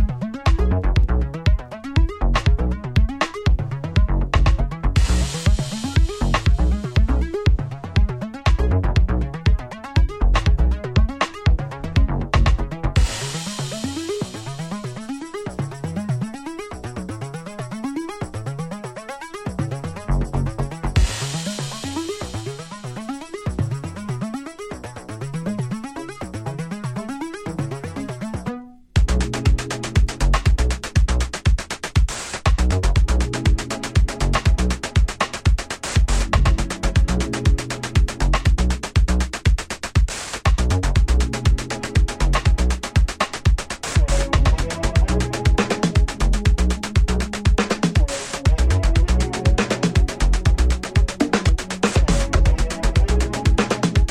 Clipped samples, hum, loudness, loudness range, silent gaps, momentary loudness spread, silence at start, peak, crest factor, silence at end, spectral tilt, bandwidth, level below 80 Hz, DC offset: under 0.1%; none; -22 LUFS; 9 LU; none; 10 LU; 0 s; -2 dBFS; 18 dB; 0 s; -5.5 dB/octave; 12 kHz; -22 dBFS; under 0.1%